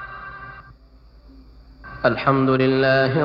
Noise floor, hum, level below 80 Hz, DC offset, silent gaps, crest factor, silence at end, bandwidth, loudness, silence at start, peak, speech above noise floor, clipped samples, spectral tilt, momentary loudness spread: -48 dBFS; none; -46 dBFS; under 0.1%; none; 18 dB; 0 s; 5.8 kHz; -18 LUFS; 0 s; -4 dBFS; 31 dB; under 0.1%; -9 dB/octave; 21 LU